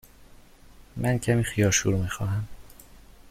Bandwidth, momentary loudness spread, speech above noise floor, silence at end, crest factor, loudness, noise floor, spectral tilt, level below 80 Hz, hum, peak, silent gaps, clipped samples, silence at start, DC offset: 15.5 kHz; 12 LU; 26 dB; 0 s; 18 dB; -25 LUFS; -51 dBFS; -4.5 dB/octave; -46 dBFS; none; -10 dBFS; none; under 0.1%; 0.2 s; under 0.1%